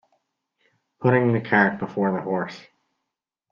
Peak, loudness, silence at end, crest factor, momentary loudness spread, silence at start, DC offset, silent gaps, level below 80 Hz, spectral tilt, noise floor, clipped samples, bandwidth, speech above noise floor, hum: -2 dBFS; -22 LUFS; 0.9 s; 22 dB; 10 LU; 1 s; under 0.1%; none; -64 dBFS; -8.5 dB/octave; -84 dBFS; under 0.1%; 7 kHz; 62 dB; none